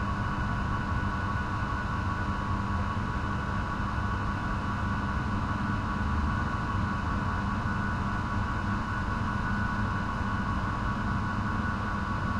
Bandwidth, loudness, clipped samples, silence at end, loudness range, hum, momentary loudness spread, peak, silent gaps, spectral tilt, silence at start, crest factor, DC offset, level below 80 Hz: 10.5 kHz; -31 LUFS; under 0.1%; 0 s; 1 LU; none; 1 LU; -18 dBFS; none; -7 dB/octave; 0 s; 12 dB; under 0.1%; -38 dBFS